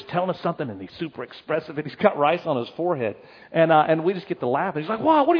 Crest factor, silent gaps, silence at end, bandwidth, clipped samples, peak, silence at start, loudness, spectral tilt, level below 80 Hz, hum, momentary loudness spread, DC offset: 20 dB; none; 0 s; 5.4 kHz; under 0.1%; -4 dBFS; 0 s; -23 LUFS; -9 dB/octave; -68 dBFS; none; 14 LU; under 0.1%